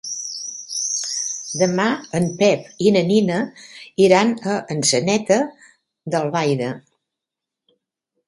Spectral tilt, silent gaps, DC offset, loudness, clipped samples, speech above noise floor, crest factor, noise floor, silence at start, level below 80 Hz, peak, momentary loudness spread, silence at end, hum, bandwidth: -4 dB/octave; none; under 0.1%; -19 LUFS; under 0.1%; 67 dB; 20 dB; -85 dBFS; 0.05 s; -62 dBFS; 0 dBFS; 12 LU; 1.5 s; none; 11.5 kHz